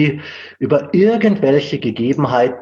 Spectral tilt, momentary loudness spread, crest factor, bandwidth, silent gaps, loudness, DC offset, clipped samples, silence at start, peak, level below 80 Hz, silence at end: -8 dB/octave; 11 LU; 14 dB; 7.2 kHz; none; -15 LUFS; under 0.1%; under 0.1%; 0 s; -2 dBFS; -58 dBFS; 0 s